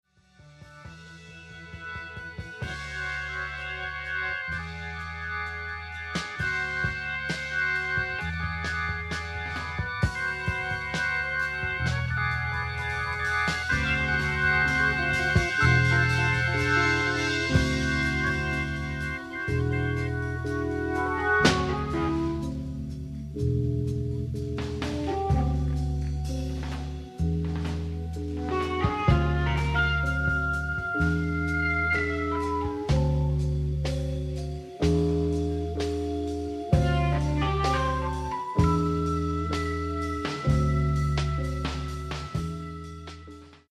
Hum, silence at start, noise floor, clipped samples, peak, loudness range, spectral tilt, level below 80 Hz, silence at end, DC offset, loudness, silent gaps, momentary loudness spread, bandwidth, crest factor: none; 0.4 s; -55 dBFS; under 0.1%; -6 dBFS; 8 LU; -6 dB/octave; -36 dBFS; 0.15 s; under 0.1%; -27 LUFS; none; 11 LU; 12.5 kHz; 22 dB